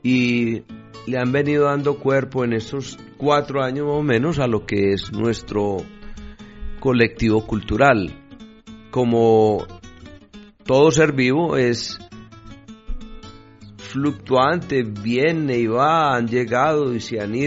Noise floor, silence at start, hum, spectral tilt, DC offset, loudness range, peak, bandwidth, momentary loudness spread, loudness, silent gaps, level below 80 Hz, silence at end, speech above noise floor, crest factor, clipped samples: -44 dBFS; 0.05 s; none; -5 dB/octave; under 0.1%; 4 LU; -2 dBFS; 7.8 kHz; 19 LU; -19 LUFS; none; -42 dBFS; 0 s; 25 dB; 18 dB; under 0.1%